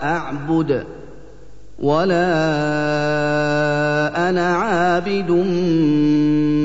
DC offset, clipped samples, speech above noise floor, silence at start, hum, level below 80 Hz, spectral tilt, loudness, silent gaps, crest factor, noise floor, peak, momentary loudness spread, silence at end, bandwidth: 2%; under 0.1%; 25 dB; 0 s; none; -46 dBFS; -7 dB/octave; -18 LUFS; none; 12 dB; -42 dBFS; -6 dBFS; 6 LU; 0 s; 8 kHz